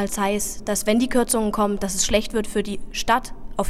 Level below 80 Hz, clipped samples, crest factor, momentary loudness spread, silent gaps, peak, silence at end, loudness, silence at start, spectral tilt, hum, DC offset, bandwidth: -36 dBFS; under 0.1%; 16 dB; 7 LU; none; -6 dBFS; 0 s; -22 LUFS; 0 s; -3.5 dB/octave; none; under 0.1%; 16 kHz